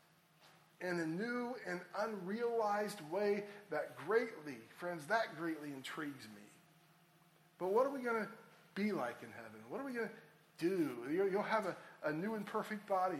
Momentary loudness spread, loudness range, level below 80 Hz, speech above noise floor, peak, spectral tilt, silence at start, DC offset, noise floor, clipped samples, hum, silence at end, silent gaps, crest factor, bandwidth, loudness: 12 LU; 3 LU; -90 dBFS; 29 dB; -22 dBFS; -5.5 dB/octave; 0.45 s; under 0.1%; -69 dBFS; under 0.1%; none; 0 s; none; 18 dB; 16 kHz; -40 LUFS